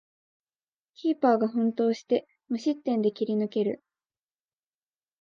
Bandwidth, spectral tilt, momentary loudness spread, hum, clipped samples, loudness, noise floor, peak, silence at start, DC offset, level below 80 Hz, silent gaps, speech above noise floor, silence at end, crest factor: 7.2 kHz; -7 dB/octave; 8 LU; none; under 0.1%; -27 LUFS; under -90 dBFS; -10 dBFS; 1 s; under 0.1%; -82 dBFS; none; over 64 dB; 1.45 s; 18 dB